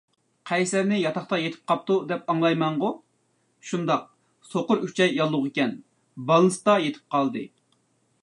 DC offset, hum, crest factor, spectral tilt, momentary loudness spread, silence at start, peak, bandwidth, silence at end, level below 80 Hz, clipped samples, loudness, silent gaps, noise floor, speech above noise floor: under 0.1%; none; 18 dB; -5.5 dB/octave; 13 LU; 0.45 s; -6 dBFS; 11.5 kHz; 0.75 s; -76 dBFS; under 0.1%; -24 LUFS; none; -69 dBFS; 45 dB